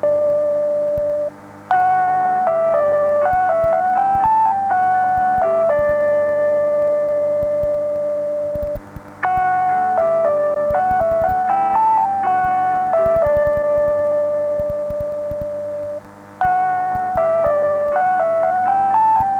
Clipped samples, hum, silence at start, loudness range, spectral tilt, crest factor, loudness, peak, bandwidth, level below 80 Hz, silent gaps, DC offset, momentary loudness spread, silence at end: under 0.1%; none; 0 s; 4 LU; -7 dB/octave; 10 dB; -17 LUFS; -6 dBFS; 15.5 kHz; -44 dBFS; none; under 0.1%; 8 LU; 0 s